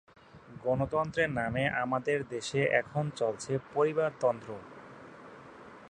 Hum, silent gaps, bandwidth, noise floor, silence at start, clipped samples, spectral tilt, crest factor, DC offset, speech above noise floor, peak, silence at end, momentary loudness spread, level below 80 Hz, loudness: none; none; 10 kHz; -51 dBFS; 0.35 s; under 0.1%; -5.5 dB/octave; 20 dB; under 0.1%; 20 dB; -12 dBFS; 0 s; 21 LU; -60 dBFS; -31 LUFS